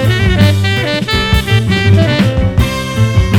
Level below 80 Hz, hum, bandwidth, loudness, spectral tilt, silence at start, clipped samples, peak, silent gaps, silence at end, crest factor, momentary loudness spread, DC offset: -20 dBFS; none; 16 kHz; -11 LUFS; -6 dB/octave; 0 s; 0.3%; 0 dBFS; none; 0 s; 10 dB; 4 LU; under 0.1%